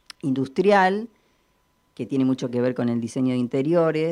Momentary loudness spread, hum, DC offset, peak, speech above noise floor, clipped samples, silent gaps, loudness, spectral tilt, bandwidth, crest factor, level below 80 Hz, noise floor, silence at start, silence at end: 10 LU; none; under 0.1%; -6 dBFS; 44 dB; under 0.1%; none; -22 LUFS; -7 dB/octave; 11 kHz; 16 dB; -68 dBFS; -66 dBFS; 0.25 s; 0 s